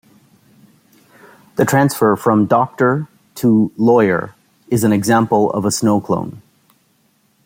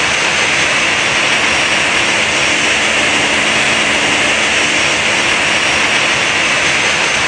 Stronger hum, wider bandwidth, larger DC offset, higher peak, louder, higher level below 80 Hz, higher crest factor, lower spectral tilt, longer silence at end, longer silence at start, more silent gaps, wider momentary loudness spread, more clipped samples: neither; first, 16.5 kHz vs 11 kHz; neither; about the same, -2 dBFS vs 0 dBFS; second, -15 LUFS vs -10 LUFS; second, -56 dBFS vs -42 dBFS; about the same, 16 dB vs 12 dB; first, -6 dB/octave vs -1 dB/octave; first, 1.05 s vs 0 s; first, 1.55 s vs 0 s; neither; first, 8 LU vs 1 LU; neither